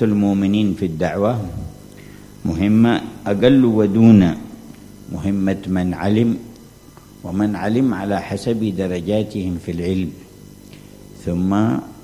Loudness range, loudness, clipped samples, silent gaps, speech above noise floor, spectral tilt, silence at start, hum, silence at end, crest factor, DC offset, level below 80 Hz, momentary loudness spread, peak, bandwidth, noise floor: 7 LU; -18 LUFS; under 0.1%; none; 26 dB; -8 dB/octave; 0 s; none; 0.05 s; 18 dB; under 0.1%; -40 dBFS; 16 LU; 0 dBFS; 15 kHz; -43 dBFS